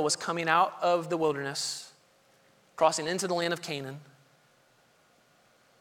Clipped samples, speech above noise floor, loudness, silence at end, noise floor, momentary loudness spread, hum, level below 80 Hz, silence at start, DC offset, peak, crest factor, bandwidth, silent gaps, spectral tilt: under 0.1%; 36 dB; -29 LUFS; 1.75 s; -65 dBFS; 16 LU; none; -78 dBFS; 0 s; under 0.1%; -10 dBFS; 22 dB; 18 kHz; none; -3 dB/octave